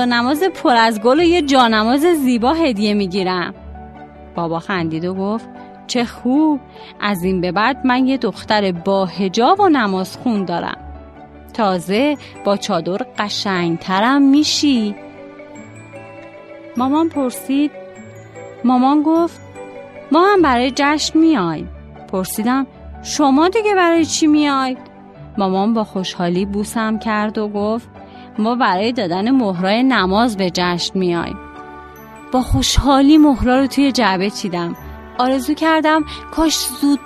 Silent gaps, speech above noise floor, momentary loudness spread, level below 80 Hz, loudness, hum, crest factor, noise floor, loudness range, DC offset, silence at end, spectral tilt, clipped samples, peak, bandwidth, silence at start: none; 23 dB; 21 LU; -36 dBFS; -16 LUFS; none; 16 dB; -38 dBFS; 5 LU; under 0.1%; 0 s; -4.5 dB/octave; under 0.1%; 0 dBFS; 13.5 kHz; 0 s